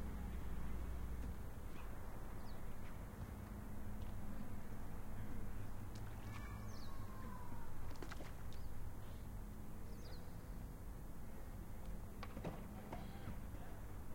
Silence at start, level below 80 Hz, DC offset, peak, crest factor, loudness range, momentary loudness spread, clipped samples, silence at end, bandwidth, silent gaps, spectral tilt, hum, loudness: 0 s; -52 dBFS; under 0.1%; -32 dBFS; 12 dB; 2 LU; 5 LU; under 0.1%; 0 s; 16.5 kHz; none; -6.5 dB/octave; none; -52 LUFS